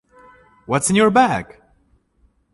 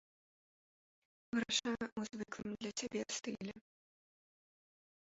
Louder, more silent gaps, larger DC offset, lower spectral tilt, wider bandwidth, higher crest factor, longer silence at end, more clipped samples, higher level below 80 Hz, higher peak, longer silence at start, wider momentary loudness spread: first, -17 LUFS vs -41 LUFS; second, none vs 1.92-1.96 s; neither; first, -4.5 dB/octave vs -2.5 dB/octave; first, 11.5 kHz vs 7.6 kHz; about the same, 18 dB vs 22 dB; second, 1.1 s vs 1.55 s; neither; first, -52 dBFS vs -76 dBFS; first, -2 dBFS vs -22 dBFS; second, 0.7 s vs 1.35 s; about the same, 12 LU vs 10 LU